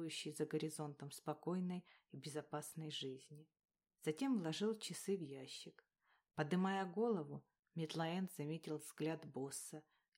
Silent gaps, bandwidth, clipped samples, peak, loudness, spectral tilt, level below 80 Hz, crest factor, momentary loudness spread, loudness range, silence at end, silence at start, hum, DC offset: 7.59-7.63 s; 16 kHz; under 0.1%; -26 dBFS; -45 LUFS; -5 dB/octave; under -90 dBFS; 18 dB; 14 LU; 4 LU; 0.35 s; 0 s; none; under 0.1%